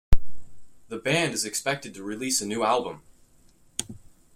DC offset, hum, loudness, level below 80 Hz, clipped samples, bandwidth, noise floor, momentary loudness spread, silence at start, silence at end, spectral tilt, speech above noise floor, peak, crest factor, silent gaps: under 0.1%; none; -27 LUFS; -34 dBFS; under 0.1%; 15.5 kHz; -57 dBFS; 15 LU; 0.1 s; 0.4 s; -3 dB/octave; 29 dB; -4 dBFS; 22 dB; none